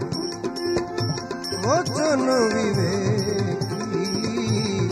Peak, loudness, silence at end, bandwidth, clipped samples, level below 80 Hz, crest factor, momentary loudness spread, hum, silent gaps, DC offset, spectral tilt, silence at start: -8 dBFS; -23 LUFS; 0 s; 14.5 kHz; under 0.1%; -52 dBFS; 16 dB; 7 LU; none; none; under 0.1%; -5.5 dB/octave; 0 s